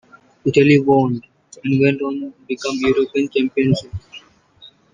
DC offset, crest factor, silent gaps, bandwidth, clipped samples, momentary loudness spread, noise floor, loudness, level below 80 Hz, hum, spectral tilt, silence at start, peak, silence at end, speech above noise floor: under 0.1%; 16 dB; none; 9.4 kHz; under 0.1%; 15 LU; -48 dBFS; -18 LUFS; -50 dBFS; none; -7 dB/octave; 0.45 s; -2 dBFS; 0.25 s; 31 dB